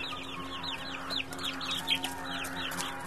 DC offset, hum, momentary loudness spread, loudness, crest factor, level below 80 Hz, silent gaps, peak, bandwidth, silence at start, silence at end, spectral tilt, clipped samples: 0.4%; none; 7 LU; -34 LUFS; 24 dB; -58 dBFS; none; -12 dBFS; 13.5 kHz; 0 s; 0 s; -2 dB/octave; under 0.1%